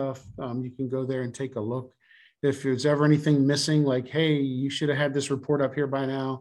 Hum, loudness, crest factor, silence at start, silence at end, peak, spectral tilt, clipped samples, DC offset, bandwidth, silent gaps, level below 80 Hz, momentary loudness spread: none; -26 LUFS; 16 dB; 0 s; 0 s; -10 dBFS; -6 dB/octave; under 0.1%; under 0.1%; 12 kHz; none; -66 dBFS; 11 LU